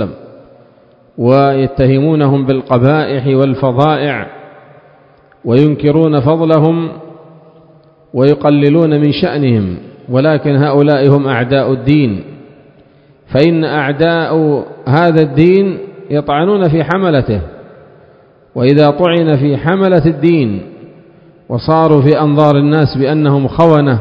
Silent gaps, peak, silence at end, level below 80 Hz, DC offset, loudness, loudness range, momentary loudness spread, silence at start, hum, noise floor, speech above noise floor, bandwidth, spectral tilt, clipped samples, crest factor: none; 0 dBFS; 0 s; -40 dBFS; under 0.1%; -11 LUFS; 2 LU; 9 LU; 0 s; none; -45 dBFS; 35 dB; 5.4 kHz; -10 dB/octave; 0.6%; 12 dB